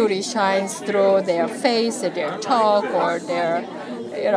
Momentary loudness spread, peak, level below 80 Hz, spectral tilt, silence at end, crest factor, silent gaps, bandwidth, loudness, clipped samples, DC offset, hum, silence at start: 8 LU; -4 dBFS; -80 dBFS; -4 dB/octave; 0 s; 18 dB; none; 11 kHz; -21 LUFS; under 0.1%; under 0.1%; none; 0 s